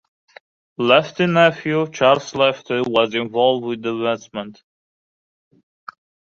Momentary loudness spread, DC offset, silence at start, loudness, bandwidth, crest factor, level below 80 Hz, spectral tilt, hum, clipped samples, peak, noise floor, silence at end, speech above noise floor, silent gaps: 9 LU; under 0.1%; 0.8 s; -18 LUFS; 7.6 kHz; 18 dB; -62 dBFS; -5.5 dB/octave; none; under 0.1%; -2 dBFS; under -90 dBFS; 1.8 s; over 72 dB; none